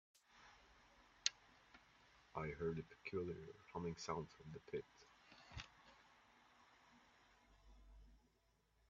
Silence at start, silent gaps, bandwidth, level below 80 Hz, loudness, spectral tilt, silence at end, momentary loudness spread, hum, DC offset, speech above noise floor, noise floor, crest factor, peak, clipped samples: 0.3 s; none; 7.4 kHz; -72 dBFS; -49 LUFS; -3.5 dB/octave; 0.7 s; 25 LU; none; under 0.1%; 31 dB; -80 dBFS; 34 dB; -20 dBFS; under 0.1%